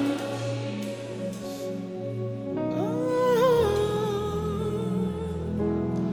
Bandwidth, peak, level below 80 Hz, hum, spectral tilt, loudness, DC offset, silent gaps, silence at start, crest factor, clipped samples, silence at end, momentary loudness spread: over 20 kHz; -12 dBFS; -52 dBFS; none; -7 dB/octave; -28 LUFS; under 0.1%; none; 0 s; 16 dB; under 0.1%; 0 s; 12 LU